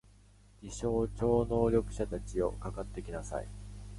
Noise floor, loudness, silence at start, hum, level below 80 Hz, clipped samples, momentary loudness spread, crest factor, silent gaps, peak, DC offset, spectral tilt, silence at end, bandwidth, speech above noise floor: -60 dBFS; -34 LUFS; 0.6 s; 50 Hz at -40 dBFS; -44 dBFS; under 0.1%; 16 LU; 18 dB; none; -16 dBFS; under 0.1%; -7 dB/octave; 0 s; 11.5 kHz; 27 dB